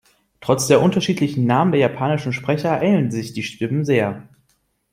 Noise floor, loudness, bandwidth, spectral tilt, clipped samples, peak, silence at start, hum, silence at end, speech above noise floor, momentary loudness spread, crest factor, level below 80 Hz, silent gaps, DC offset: -66 dBFS; -19 LUFS; 16.5 kHz; -6 dB/octave; under 0.1%; -2 dBFS; 0.4 s; none; 0.7 s; 47 dB; 10 LU; 18 dB; -56 dBFS; none; under 0.1%